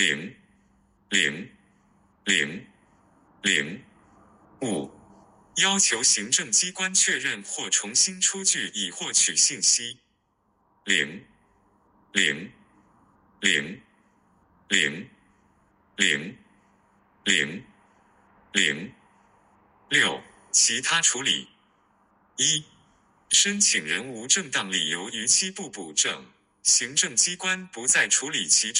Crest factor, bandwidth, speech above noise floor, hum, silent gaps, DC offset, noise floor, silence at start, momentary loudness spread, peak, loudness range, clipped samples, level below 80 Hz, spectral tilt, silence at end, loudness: 22 dB; 16 kHz; 45 dB; none; none; under 0.1%; -70 dBFS; 0 s; 15 LU; -4 dBFS; 7 LU; under 0.1%; -70 dBFS; 0 dB/octave; 0 s; -22 LUFS